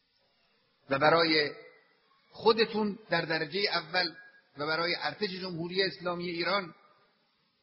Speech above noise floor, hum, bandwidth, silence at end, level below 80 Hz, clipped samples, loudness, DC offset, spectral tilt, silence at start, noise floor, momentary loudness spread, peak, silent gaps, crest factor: 43 dB; none; 6 kHz; 0.9 s; -72 dBFS; under 0.1%; -30 LUFS; under 0.1%; -2 dB/octave; 0.9 s; -73 dBFS; 10 LU; -10 dBFS; none; 22 dB